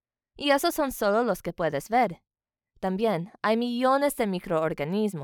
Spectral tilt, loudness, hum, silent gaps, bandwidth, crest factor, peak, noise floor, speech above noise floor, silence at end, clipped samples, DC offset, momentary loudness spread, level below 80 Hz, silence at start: -5 dB/octave; -26 LUFS; none; none; over 20 kHz; 18 dB; -8 dBFS; -69 dBFS; 43 dB; 0 s; under 0.1%; under 0.1%; 6 LU; -58 dBFS; 0.4 s